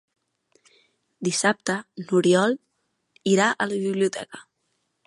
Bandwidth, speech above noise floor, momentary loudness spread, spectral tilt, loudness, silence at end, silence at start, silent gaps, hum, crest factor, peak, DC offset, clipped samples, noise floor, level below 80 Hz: 11.5 kHz; 52 dB; 13 LU; -4.5 dB/octave; -23 LUFS; 0.65 s; 1.2 s; none; none; 20 dB; -6 dBFS; under 0.1%; under 0.1%; -74 dBFS; -74 dBFS